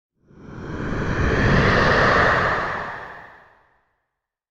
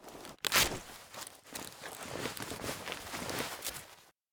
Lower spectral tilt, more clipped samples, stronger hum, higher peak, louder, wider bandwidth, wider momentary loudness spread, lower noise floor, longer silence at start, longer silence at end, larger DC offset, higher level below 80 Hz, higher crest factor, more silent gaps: first, -6 dB/octave vs -1.5 dB/octave; neither; neither; first, -4 dBFS vs -8 dBFS; first, -19 LUFS vs -36 LUFS; second, 9.4 kHz vs over 20 kHz; about the same, 18 LU vs 18 LU; first, -80 dBFS vs -58 dBFS; first, 0.4 s vs 0 s; first, 1.25 s vs 0.2 s; neither; first, -32 dBFS vs -58 dBFS; second, 18 dB vs 32 dB; neither